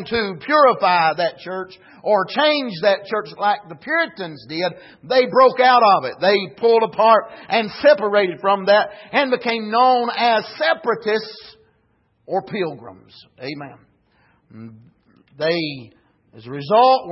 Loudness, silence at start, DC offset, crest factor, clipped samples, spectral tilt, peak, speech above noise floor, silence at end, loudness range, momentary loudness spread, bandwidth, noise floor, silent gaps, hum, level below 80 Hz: -18 LUFS; 0 s; under 0.1%; 16 dB; under 0.1%; -8 dB/octave; -2 dBFS; 45 dB; 0 s; 13 LU; 16 LU; 5.8 kHz; -63 dBFS; none; none; -64 dBFS